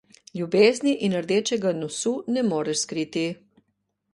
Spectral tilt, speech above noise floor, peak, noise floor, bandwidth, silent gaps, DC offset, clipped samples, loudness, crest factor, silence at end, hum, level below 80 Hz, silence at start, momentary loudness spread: -4.5 dB/octave; 52 dB; -4 dBFS; -75 dBFS; 11.5 kHz; none; under 0.1%; under 0.1%; -24 LUFS; 22 dB; 0.8 s; none; -70 dBFS; 0.35 s; 11 LU